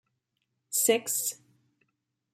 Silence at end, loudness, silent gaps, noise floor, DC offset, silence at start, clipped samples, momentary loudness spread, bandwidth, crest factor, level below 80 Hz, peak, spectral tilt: 1 s; -27 LUFS; none; -81 dBFS; under 0.1%; 0.7 s; under 0.1%; 10 LU; 16 kHz; 20 dB; -86 dBFS; -12 dBFS; -1 dB/octave